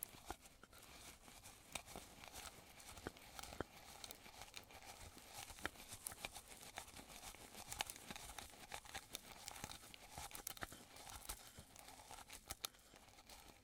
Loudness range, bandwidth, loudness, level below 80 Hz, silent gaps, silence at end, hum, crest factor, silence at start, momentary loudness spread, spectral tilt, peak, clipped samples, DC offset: 4 LU; 18 kHz; -54 LUFS; -68 dBFS; none; 0 s; none; 34 dB; 0 s; 9 LU; -1.5 dB/octave; -22 dBFS; under 0.1%; under 0.1%